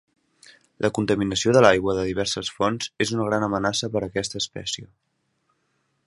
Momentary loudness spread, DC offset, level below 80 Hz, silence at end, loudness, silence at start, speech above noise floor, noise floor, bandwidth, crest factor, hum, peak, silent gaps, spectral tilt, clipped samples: 11 LU; under 0.1%; -52 dBFS; 1.2 s; -23 LUFS; 0.8 s; 48 dB; -71 dBFS; 11.5 kHz; 24 dB; none; 0 dBFS; none; -4.5 dB/octave; under 0.1%